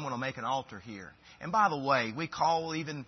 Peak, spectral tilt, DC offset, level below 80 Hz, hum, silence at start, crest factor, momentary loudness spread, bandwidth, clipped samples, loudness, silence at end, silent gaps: -14 dBFS; -3 dB/octave; under 0.1%; -68 dBFS; none; 0 s; 18 dB; 17 LU; 6.2 kHz; under 0.1%; -31 LUFS; 0 s; none